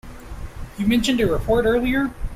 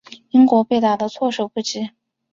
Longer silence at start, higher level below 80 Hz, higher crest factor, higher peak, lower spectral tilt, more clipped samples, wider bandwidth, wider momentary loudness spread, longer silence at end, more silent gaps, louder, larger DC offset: about the same, 0.05 s vs 0.1 s; first, -32 dBFS vs -64 dBFS; about the same, 14 dB vs 16 dB; second, -8 dBFS vs -2 dBFS; about the same, -5.5 dB/octave vs -5 dB/octave; neither; first, 15 kHz vs 7.6 kHz; first, 19 LU vs 12 LU; second, 0 s vs 0.45 s; neither; about the same, -20 LUFS vs -18 LUFS; neither